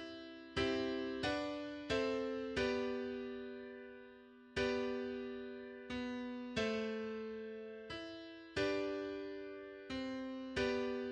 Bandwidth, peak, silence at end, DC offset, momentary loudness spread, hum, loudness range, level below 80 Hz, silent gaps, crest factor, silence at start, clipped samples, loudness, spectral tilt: 9.8 kHz; -24 dBFS; 0 s; under 0.1%; 12 LU; none; 4 LU; -64 dBFS; none; 18 dB; 0 s; under 0.1%; -41 LUFS; -5 dB/octave